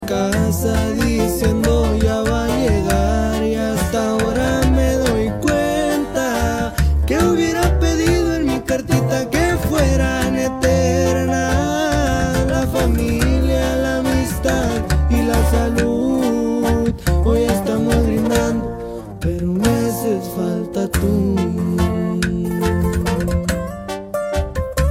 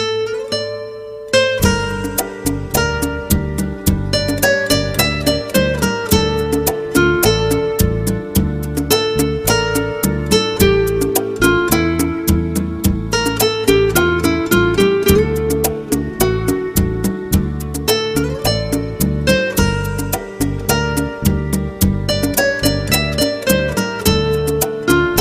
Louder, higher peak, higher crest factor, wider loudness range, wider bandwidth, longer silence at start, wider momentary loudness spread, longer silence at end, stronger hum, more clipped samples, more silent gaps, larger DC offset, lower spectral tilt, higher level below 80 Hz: about the same, -18 LUFS vs -16 LUFS; about the same, -2 dBFS vs 0 dBFS; about the same, 14 dB vs 16 dB; about the same, 2 LU vs 3 LU; about the same, 16 kHz vs 16 kHz; about the same, 0 s vs 0 s; about the same, 5 LU vs 7 LU; about the same, 0 s vs 0 s; neither; neither; neither; neither; first, -6 dB/octave vs -4.5 dB/octave; about the same, -24 dBFS vs -28 dBFS